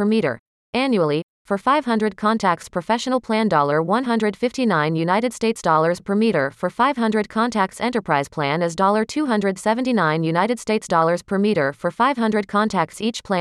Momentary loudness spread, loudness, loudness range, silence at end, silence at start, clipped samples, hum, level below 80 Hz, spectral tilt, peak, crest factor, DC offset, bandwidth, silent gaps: 5 LU; -20 LUFS; 1 LU; 0 s; 0 s; under 0.1%; none; -58 dBFS; -5.5 dB/octave; -4 dBFS; 16 dB; under 0.1%; 12.5 kHz; 0.39-0.73 s, 1.23-1.45 s